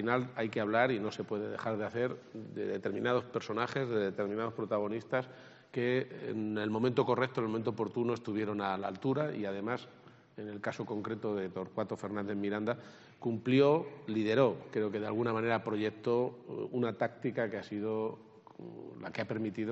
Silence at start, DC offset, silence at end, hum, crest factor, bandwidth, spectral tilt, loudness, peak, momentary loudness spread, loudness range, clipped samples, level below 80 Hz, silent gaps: 0 s; under 0.1%; 0 s; none; 20 dB; 8 kHz; -5.5 dB/octave; -35 LUFS; -14 dBFS; 11 LU; 6 LU; under 0.1%; -78 dBFS; none